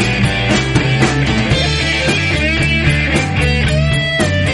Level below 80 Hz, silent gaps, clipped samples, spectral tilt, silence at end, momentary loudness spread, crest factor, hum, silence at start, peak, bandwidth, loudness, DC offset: -24 dBFS; none; under 0.1%; -5 dB/octave; 0 s; 2 LU; 14 dB; none; 0 s; 0 dBFS; 11.5 kHz; -13 LUFS; under 0.1%